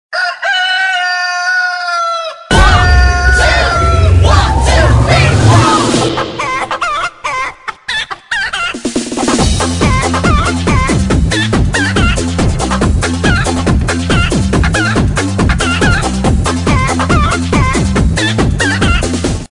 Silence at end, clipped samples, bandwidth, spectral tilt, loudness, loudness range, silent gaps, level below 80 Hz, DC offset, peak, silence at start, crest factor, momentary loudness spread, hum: 0.05 s; 0.4%; 11 kHz; -5 dB/octave; -11 LUFS; 5 LU; none; -18 dBFS; under 0.1%; 0 dBFS; 0.1 s; 10 dB; 8 LU; none